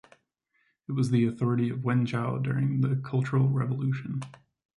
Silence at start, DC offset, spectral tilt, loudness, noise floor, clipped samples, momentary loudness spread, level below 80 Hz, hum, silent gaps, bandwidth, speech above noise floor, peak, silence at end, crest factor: 0.9 s; under 0.1%; -8.5 dB/octave; -28 LUFS; -73 dBFS; under 0.1%; 10 LU; -66 dBFS; none; none; 11 kHz; 47 dB; -14 dBFS; 0.45 s; 14 dB